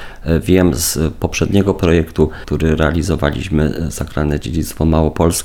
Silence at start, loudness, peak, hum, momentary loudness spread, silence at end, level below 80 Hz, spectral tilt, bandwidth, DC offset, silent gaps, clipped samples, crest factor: 0 s; -16 LUFS; 0 dBFS; none; 5 LU; 0 s; -26 dBFS; -5.5 dB/octave; 18 kHz; under 0.1%; none; under 0.1%; 14 dB